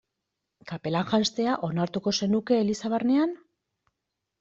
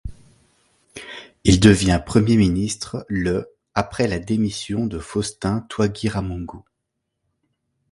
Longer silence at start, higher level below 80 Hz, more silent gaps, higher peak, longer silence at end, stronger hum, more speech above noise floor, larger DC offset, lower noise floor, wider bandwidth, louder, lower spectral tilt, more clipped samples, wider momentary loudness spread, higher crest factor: first, 0.65 s vs 0.05 s; second, -64 dBFS vs -36 dBFS; neither; second, -10 dBFS vs 0 dBFS; second, 1.05 s vs 1.3 s; neither; about the same, 58 dB vs 59 dB; neither; first, -84 dBFS vs -78 dBFS; second, 8 kHz vs 11.5 kHz; second, -26 LUFS vs -20 LUFS; about the same, -5.5 dB/octave vs -5.5 dB/octave; neither; second, 7 LU vs 21 LU; about the same, 18 dB vs 22 dB